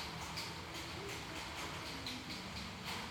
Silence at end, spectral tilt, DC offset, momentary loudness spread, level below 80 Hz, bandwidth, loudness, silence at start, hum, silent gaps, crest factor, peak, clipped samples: 0 s; -3 dB/octave; under 0.1%; 2 LU; -60 dBFS; 19.5 kHz; -44 LUFS; 0 s; none; none; 16 dB; -30 dBFS; under 0.1%